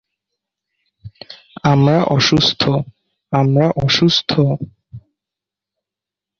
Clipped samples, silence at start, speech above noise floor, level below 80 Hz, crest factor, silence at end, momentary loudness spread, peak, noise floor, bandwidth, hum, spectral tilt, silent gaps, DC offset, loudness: under 0.1%; 1.05 s; 72 dB; -48 dBFS; 16 dB; 1.4 s; 17 LU; -2 dBFS; -86 dBFS; 7.2 kHz; 50 Hz at -55 dBFS; -5.5 dB/octave; none; under 0.1%; -15 LUFS